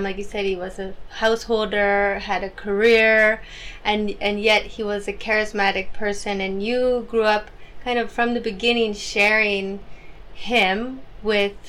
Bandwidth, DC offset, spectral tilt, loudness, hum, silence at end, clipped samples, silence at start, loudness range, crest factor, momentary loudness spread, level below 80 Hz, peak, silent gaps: 15 kHz; under 0.1%; -4 dB/octave; -21 LUFS; none; 0 s; under 0.1%; 0 s; 3 LU; 14 dB; 12 LU; -42 dBFS; -6 dBFS; none